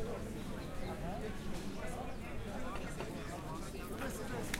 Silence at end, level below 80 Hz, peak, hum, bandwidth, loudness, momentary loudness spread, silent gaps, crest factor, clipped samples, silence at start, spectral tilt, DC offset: 0 s; -48 dBFS; -18 dBFS; none; 16 kHz; -44 LUFS; 3 LU; none; 24 dB; under 0.1%; 0 s; -5 dB/octave; under 0.1%